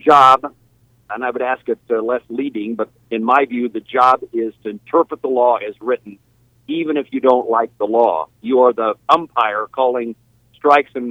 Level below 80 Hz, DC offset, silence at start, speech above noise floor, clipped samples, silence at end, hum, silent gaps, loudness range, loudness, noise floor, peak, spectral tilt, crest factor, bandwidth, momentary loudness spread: -62 dBFS; under 0.1%; 0.05 s; 39 dB; under 0.1%; 0 s; none; none; 4 LU; -17 LUFS; -55 dBFS; 0 dBFS; -5.5 dB/octave; 16 dB; 11.5 kHz; 10 LU